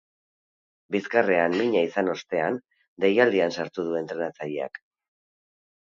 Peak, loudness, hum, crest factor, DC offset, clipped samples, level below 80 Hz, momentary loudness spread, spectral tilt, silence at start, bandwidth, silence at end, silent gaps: -4 dBFS; -25 LUFS; none; 22 dB; under 0.1%; under 0.1%; -72 dBFS; 11 LU; -6 dB/octave; 0.9 s; 7.4 kHz; 1.05 s; 2.88-2.97 s